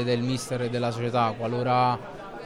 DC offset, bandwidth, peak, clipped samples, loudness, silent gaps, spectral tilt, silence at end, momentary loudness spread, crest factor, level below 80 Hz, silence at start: under 0.1%; 14 kHz; -12 dBFS; under 0.1%; -26 LUFS; none; -6 dB/octave; 0 s; 6 LU; 14 dB; -58 dBFS; 0 s